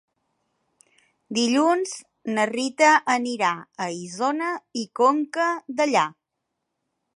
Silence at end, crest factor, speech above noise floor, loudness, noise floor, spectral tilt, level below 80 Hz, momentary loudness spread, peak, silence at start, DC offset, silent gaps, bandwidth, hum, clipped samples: 1.05 s; 20 dB; 58 dB; -23 LUFS; -80 dBFS; -3 dB/octave; -80 dBFS; 12 LU; -4 dBFS; 1.3 s; under 0.1%; none; 11.5 kHz; none; under 0.1%